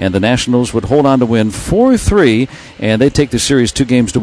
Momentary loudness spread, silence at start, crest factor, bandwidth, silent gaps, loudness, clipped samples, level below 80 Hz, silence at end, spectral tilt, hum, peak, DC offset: 5 LU; 0 s; 12 dB; 11 kHz; none; -12 LUFS; under 0.1%; -28 dBFS; 0 s; -5.5 dB/octave; none; 0 dBFS; under 0.1%